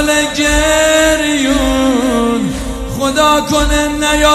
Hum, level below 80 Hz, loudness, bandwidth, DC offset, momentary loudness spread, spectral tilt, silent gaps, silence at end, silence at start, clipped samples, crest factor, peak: none; -24 dBFS; -12 LUFS; 15.5 kHz; under 0.1%; 7 LU; -3 dB/octave; none; 0 s; 0 s; under 0.1%; 12 dB; 0 dBFS